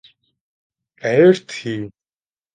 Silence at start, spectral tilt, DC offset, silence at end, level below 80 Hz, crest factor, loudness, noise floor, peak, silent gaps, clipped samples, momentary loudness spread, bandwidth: 1.05 s; -6.5 dB/octave; under 0.1%; 0.65 s; -64 dBFS; 18 dB; -17 LUFS; under -90 dBFS; -2 dBFS; none; under 0.1%; 16 LU; 9.2 kHz